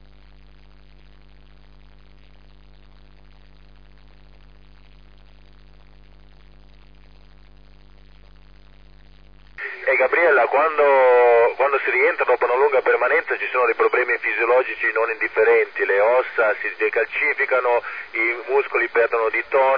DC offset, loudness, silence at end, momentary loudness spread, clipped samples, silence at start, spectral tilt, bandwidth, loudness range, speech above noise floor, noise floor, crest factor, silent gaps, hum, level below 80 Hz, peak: 0.4%; -18 LUFS; 0 s; 6 LU; under 0.1%; 9.6 s; -6 dB/octave; 5.2 kHz; 5 LU; 30 dB; -49 dBFS; 16 dB; none; none; -52 dBFS; -6 dBFS